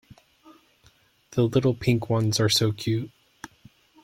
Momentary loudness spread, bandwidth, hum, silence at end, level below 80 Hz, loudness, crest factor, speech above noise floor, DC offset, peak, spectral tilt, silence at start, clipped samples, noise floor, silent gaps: 24 LU; 16 kHz; none; 0.95 s; -56 dBFS; -24 LUFS; 20 dB; 37 dB; under 0.1%; -8 dBFS; -5 dB/octave; 1.3 s; under 0.1%; -60 dBFS; none